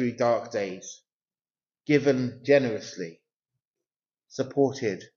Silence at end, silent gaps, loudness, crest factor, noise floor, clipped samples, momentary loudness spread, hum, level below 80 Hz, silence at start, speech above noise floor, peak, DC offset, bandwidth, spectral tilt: 0.1 s; 1.13-1.20 s, 3.36-3.40 s, 3.67-3.74 s; -26 LUFS; 22 dB; under -90 dBFS; under 0.1%; 18 LU; none; -72 dBFS; 0 s; over 64 dB; -6 dBFS; under 0.1%; 7.4 kHz; -5.5 dB/octave